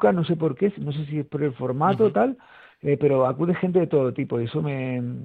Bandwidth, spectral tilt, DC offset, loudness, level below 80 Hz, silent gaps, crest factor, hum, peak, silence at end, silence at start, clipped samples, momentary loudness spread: 4.6 kHz; -10 dB/octave; under 0.1%; -23 LUFS; -62 dBFS; none; 18 dB; none; -6 dBFS; 0 s; 0 s; under 0.1%; 8 LU